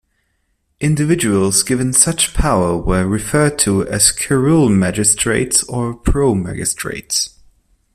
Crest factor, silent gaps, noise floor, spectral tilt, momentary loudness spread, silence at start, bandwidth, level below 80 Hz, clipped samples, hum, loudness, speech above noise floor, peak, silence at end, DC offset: 16 dB; none; -65 dBFS; -4 dB/octave; 7 LU; 0.8 s; 16 kHz; -30 dBFS; under 0.1%; none; -15 LUFS; 50 dB; 0 dBFS; 0.65 s; under 0.1%